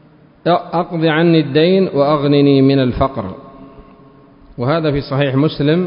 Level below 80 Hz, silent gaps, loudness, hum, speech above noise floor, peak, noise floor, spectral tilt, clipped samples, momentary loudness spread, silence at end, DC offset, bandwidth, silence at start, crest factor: -40 dBFS; none; -14 LUFS; none; 30 dB; 0 dBFS; -43 dBFS; -12.5 dB/octave; under 0.1%; 10 LU; 0 s; under 0.1%; 5.4 kHz; 0.45 s; 14 dB